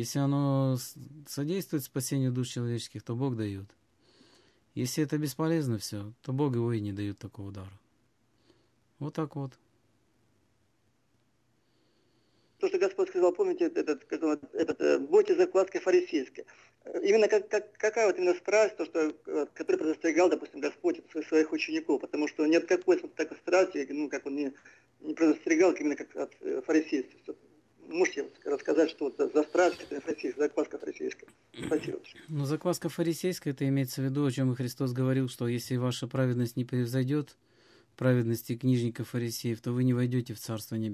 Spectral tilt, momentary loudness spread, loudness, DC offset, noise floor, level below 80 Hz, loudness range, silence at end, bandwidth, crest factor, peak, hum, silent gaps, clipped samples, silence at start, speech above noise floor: -6.5 dB/octave; 12 LU; -30 LUFS; under 0.1%; -73 dBFS; -68 dBFS; 8 LU; 0 s; 14.5 kHz; 18 dB; -12 dBFS; none; none; under 0.1%; 0 s; 43 dB